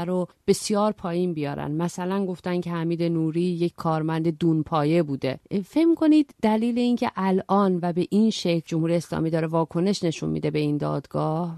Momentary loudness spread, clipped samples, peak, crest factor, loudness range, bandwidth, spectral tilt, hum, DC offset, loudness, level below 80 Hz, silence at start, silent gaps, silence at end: 6 LU; under 0.1%; -8 dBFS; 16 dB; 4 LU; 13 kHz; -6.5 dB/octave; none; under 0.1%; -24 LUFS; -58 dBFS; 0 s; none; 0 s